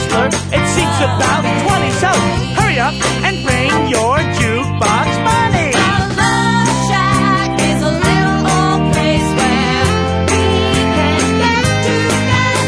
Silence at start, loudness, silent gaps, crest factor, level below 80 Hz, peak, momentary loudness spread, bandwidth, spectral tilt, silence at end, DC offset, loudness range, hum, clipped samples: 0 s; -13 LUFS; none; 12 dB; -30 dBFS; 0 dBFS; 2 LU; 11 kHz; -4.5 dB/octave; 0 s; under 0.1%; 1 LU; none; under 0.1%